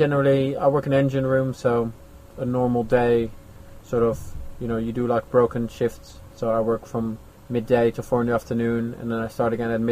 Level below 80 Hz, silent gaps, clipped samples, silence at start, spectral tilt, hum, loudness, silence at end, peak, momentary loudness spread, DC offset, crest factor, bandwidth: -44 dBFS; none; under 0.1%; 0 s; -8 dB/octave; none; -23 LUFS; 0 s; -4 dBFS; 10 LU; under 0.1%; 18 dB; 15.5 kHz